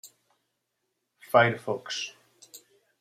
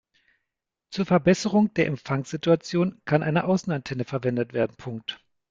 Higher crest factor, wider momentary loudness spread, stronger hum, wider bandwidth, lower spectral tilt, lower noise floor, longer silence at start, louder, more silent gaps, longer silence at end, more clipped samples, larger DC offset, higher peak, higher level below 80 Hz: about the same, 24 dB vs 20 dB; about the same, 12 LU vs 13 LU; neither; first, 16 kHz vs 7.8 kHz; second, -4 dB/octave vs -6.5 dB/octave; second, -80 dBFS vs -84 dBFS; second, 0.05 s vs 0.9 s; about the same, -26 LUFS vs -25 LUFS; neither; about the same, 0.45 s vs 0.35 s; neither; neither; about the same, -6 dBFS vs -6 dBFS; second, -74 dBFS vs -60 dBFS